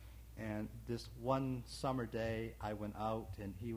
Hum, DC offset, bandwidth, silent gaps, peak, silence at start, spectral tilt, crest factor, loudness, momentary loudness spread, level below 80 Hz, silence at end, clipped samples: none; under 0.1%; 19.5 kHz; none; -22 dBFS; 0 s; -6.5 dB/octave; 20 dB; -42 LUFS; 8 LU; -56 dBFS; 0 s; under 0.1%